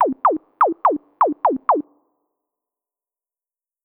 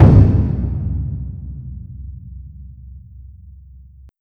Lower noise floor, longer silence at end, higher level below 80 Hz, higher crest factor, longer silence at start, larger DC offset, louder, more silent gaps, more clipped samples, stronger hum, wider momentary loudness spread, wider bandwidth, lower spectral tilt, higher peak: first, under -90 dBFS vs -42 dBFS; first, 2.05 s vs 0.95 s; second, -70 dBFS vs -24 dBFS; about the same, 16 dB vs 18 dB; about the same, 0 s vs 0 s; neither; about the same, -19 LUFS vs -17 LUFS; neither; second, under 0.1% vs 0.1%; neither; second, 3 LU vs 26 LU; first, 4.3 kHz vs 3.4 kHz; second, -9 dB/octave vs -11.5 dB/octave; second, -6 dBFS vs 0 dBFS